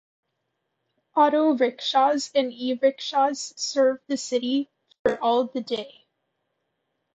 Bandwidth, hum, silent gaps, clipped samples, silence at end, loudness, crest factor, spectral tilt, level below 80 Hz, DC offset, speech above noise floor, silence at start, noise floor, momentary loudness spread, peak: 8.6 kHz; none; 4.99-5.05 s; under 0.1%; 1.25 s; -24 LUFS; 18 dB; -2.5 dB/octave; -68 dBFS; under 0.1%; 55 dB; 1.15 s; -78 dBFS; 9 LU; -8 dBFS